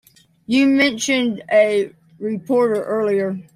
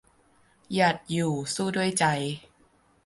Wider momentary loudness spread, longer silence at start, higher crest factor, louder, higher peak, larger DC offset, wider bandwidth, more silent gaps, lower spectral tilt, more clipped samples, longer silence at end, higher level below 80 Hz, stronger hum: first, 11 LU vs 8 LU; second, 0.5 s vs 0.7 s; second, 14 dB vs 20 dB; first, -18 LUFS vs -26 LUFS; first, -4 dBFS vs -10 dBFS; neither; first, 15 kHz vs 11.5 kHz; neither; about the same, -4 dB/octave vs -4.5 dB/octave; neither; second, 0.15 s vs 0.65 s; about the same, -64 dBFS vs -64 dBFS; neither